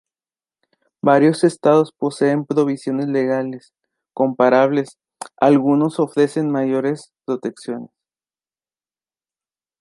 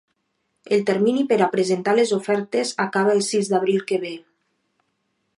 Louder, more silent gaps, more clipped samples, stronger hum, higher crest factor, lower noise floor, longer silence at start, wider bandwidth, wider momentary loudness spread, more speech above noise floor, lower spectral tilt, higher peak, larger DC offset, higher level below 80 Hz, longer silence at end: first, -18 LUFS vs -21 LUFS; neither; neither; neither; about the same, 18 dB vs 16 dB; first, under -90 dBFS vs -73 dBFS; first, 1.05 s vs 0.7 s; about the same, 11.5 kHz vs 11.5 kHz; first, 16 LU vs 6 LU; first, over 73 dB vs 53 dB; first, -7 dB/octave vs -4.5 dB/octave; first, -2 dBFS vs -6 dBFS; neither; first, -70 dBFS vs -76 dBFS; first, 1.95 s vs 1.2 s